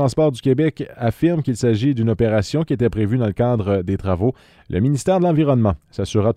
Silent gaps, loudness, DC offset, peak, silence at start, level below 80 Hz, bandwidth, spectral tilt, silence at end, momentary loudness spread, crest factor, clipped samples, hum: none; -19 LUFS; under 0.1%; -4 dBFS; 0 s; -42 dBFS; 13.5 kHz; -7.5 dB/octave; 0 s; 5 LU; 14 dB; under 0.1%; none